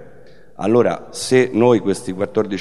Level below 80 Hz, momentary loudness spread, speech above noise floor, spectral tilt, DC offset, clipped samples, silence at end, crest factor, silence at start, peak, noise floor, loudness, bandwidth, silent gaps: -56 dBFS; 9 LU; 29 dB; -5.5 dB/octave; 0.9%; under 0.1%; 0 s; 18 dB; 0 s; 0 dBFS; -46 dBFS; -17 LUFS; 12.5 kHz; none